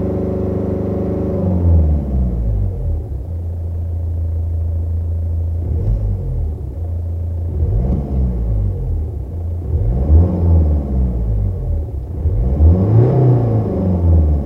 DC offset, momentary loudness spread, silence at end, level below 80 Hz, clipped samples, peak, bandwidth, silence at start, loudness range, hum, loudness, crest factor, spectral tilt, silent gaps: under 0.1%; 10 LU; 0 s; -20 dBFS; under 0.1%; 0 dBFS; 2.3 kHz; 0 s; 6 LU; none; -18 LUFS; 16 dB; -12 dB/octave; none